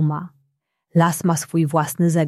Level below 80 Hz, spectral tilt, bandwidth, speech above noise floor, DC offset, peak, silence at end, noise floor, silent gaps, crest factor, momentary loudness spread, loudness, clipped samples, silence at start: -62 dBFS; -6.5 dB/octave; 14.5 kHz; 52 dB; under 0.1%; -4 dBFS; 0 s; -71 dBFS; none; 16 dB; 8 LU; -20 LUFS; under 0.1%; 0 s